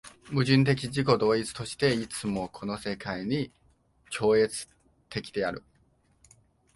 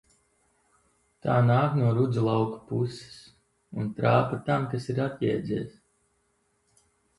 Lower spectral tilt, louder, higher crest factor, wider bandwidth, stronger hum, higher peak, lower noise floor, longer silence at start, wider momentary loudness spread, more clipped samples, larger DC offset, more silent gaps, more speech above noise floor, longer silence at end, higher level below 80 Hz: second, -5.5 dB/octave vs -8.5 dB/octave; about the same, -28 LUFS vs -27 LUFS; about the same, 22 dB vs 18 dB; about the same, 11.5 kHz vs 11 kHz; neither; about the same, -8 dBFS vs -10 dBFS; second, -66 dBFS vs -72 dBFS; second, 0.05 s vs 1.25 s; about the same, 14 LU vs 12 LU; neither; neither; neither; second, 39 dB vs 46 dB; second, 1.15 s vs 1.5 s; about the same, -58 dBFS vs -60 dBFS